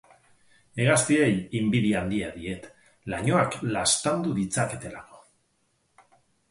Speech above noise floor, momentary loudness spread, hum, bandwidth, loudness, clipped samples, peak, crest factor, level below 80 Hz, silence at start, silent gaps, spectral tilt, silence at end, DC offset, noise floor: 46 dB; 16 LU; none; 11.5 kHz; -25 LUFS; under 0.1%; -8 dBFS; 20 dB; -54 dBFS; 0.75 s; none; -4.5 dB/octave; 1.3 s; under 0.1%; -71 dBFS